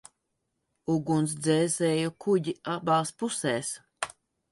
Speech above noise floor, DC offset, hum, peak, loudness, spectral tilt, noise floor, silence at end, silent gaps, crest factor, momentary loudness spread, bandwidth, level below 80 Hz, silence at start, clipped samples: 53 dB; under 0.1%; none; -10 dBFS; -28 LUFS; -5 dB/octave; -80 dBFS; 0.45 s; none; 20 dB; 11 LU; 11.5 kHz; -70 dBFS; 0.9 s; under 0.1%